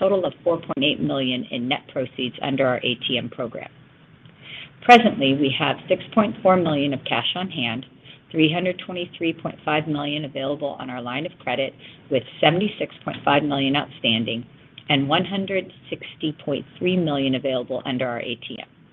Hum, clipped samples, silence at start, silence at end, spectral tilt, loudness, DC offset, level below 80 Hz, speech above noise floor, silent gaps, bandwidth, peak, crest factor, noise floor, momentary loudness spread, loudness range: none; under 0.1%; 0 s; 0.3 s; -6.5 dB/octave; -22 LUFS; under 0.1%; -64 dBFS; 27 dB; none; 8.2 kHz; 0 dBFS; 22 dB; -49 dBFS; 12 LU; 6 LU